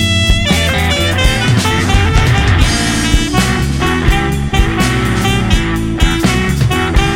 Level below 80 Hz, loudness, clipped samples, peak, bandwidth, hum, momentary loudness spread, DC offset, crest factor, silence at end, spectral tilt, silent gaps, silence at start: -16 dBFS; -12 LUFS; under 0.1%; 0 dBFS; 17 kHz; none; 3 LU; 0.2%; 10 dB; 0 s; -4.5 dB/octave; none; 0 s